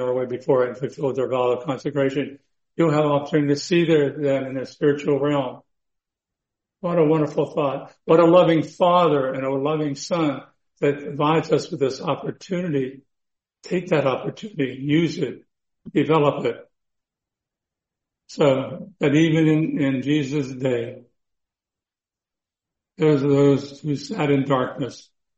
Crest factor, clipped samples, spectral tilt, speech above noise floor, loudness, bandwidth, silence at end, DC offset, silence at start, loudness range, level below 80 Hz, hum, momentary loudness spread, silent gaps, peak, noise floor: 18 dB; under 0.1%; -7 dB/octave; over 69 dB; -21 LUFS; 8.2 kHz; 0.4 s; under 0.1%; 0 s; 6 LU; -64 dBFS; none; 11 LU; none; -4 dBFS; under -90 dBFS